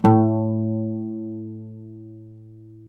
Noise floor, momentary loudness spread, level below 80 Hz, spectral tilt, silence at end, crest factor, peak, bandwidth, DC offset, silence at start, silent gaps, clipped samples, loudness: -44 dBFS; 25 LU; -60 dBFS; -10.5 dB/octave; 0 s; 20 dB; -2 dBFS; 6 kHz; under 0.1%; 0 s; none; under 0.1%; -23 LUFS